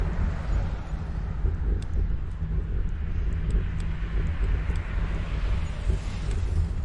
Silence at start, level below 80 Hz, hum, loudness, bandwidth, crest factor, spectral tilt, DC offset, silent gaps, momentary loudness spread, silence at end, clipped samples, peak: 0 s; -28 dBFS; none; -30 LUFS; 8.8 kHz; 14 dB; -7.5 dB/octave; under 0.1%; none; 3 LU; 0 s; under 0.1%; -12 dBFS